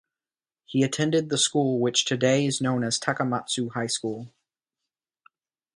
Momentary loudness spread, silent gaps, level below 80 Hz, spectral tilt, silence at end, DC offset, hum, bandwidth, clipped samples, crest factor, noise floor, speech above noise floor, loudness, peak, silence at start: 6 LU; none; -68 dBFS; -4 dB/octave; 1.5 s; under 0.1%; none; 11.5 kHz; under 0.1%; 20 dB; under -90 dBFS; over 65 dB; -25 LUFS; -6 dBFS; 0.7 s